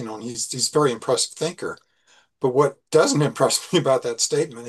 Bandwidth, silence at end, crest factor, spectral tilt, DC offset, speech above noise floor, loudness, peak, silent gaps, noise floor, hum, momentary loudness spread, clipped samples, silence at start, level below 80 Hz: 12.5 kHz; 0 s; 18 dB; -4 dB/octave; under 0.1%; 38 dB; -21 LUFS; -4 dBFS; none; -59 dBFS; none; 9 LU; under 0.1%; 0 s; -70 dBFS